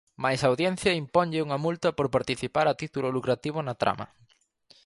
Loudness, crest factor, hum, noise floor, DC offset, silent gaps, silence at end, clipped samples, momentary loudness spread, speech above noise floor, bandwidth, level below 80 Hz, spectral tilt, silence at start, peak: -27 LUFS; 20 dB; none; -64 dBFS; under 0.1%; none; 0.8 s; under 0.1%; 5 LU; 37 dB; 11.5 kHz; -58 dBFS; -5.5 dB/octave; 0.2 s; -8 dBFS